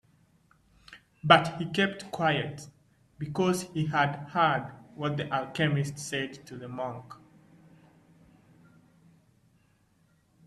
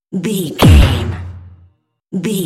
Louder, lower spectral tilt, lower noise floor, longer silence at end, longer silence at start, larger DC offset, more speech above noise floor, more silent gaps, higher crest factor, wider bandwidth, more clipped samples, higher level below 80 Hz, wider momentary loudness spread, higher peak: second, -28 LUFS vs -13 LUFS; about the same, -5 dB/octave vs -6 dB/octave; first, -67 dBFS vs -51 dBFS; first, 3.35 s vs 0 s; first, 0.9 s vs 0.1 s; neither; about the same, 38 dB vs 40 dB; neither; first, 30 dB vs 14 dB; second, 14 kHz vs 16 kHz; second, under 0.1% vs 0.3%; second, -66 dBFS vs -20 dBFS; about the same, 20 LU vs 18 LU; about the same, -2 dBFS vs 0 dBFS